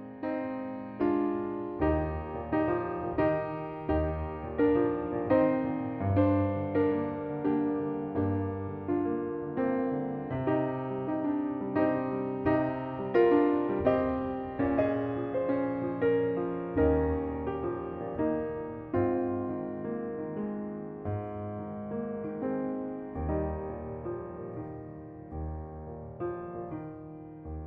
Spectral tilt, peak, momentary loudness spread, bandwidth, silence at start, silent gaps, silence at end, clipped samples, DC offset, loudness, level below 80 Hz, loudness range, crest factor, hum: -11.5 dB/octave; -12 dBFS; 12 LU; 4.7 kHz; 0 s; none; 0 s; under 0.1%; under 0.1%; -31 LUFS; -48 dBFS; 8 LU; 18 dB; none